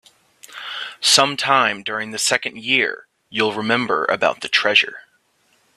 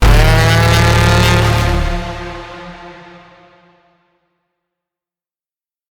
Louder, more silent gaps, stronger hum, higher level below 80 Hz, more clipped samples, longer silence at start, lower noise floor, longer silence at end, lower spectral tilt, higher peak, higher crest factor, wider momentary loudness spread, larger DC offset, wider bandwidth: second, -18 LUFS vs -12 LUFS; neither; neither; second, -66 dBFS vs -20 dBFS; neither; first, 0.5 s vs 0 s; second, -62 dBFS vs under -90 dBFS; second, 0.75 s vs 3 s; second, -1.5 dB/octave vs -5 dB/octave; about the same, 0 dBFS vs 0 dBFS; first, 20 dB vs 14 dB; second, 14 LU vs 21 LU; neither; second, 15.5 kHz vs 19 kHz